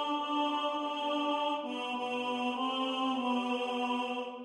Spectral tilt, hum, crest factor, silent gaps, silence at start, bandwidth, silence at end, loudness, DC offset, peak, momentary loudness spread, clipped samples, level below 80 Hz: -3 dB/octave; none; 14 dB; none; 0 s; 11 kHz; 0 s; -33 LUFS; under 0.1%; -20 dBFS; 3 LU; under 0.1%; -84 dBFS